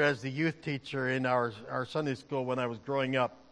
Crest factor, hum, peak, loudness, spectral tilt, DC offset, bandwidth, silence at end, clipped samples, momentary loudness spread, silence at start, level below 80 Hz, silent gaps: 18 dB; none; -14 dBFS; -32 LUFS; -6.5 dB/octave; under 0.1%; 10.5 kHz; 0.15 s; under 0.1%; 6 LU; 0 s; -72 dBFS; none